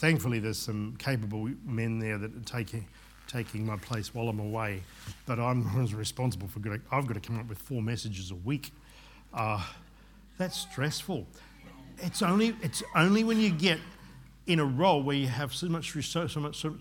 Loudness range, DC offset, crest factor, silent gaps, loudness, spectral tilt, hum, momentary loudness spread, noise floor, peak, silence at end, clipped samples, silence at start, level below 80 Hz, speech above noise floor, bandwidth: 8 LU; under 0.1%; 24 dB; none; -31 LUFS; -5.5 dB/octave; none; 14 LU; -55 dBFS; -8 dBFS; 0 s; under 0.1%; 0 s; -56 dBFS; 24 dB; 18 kHz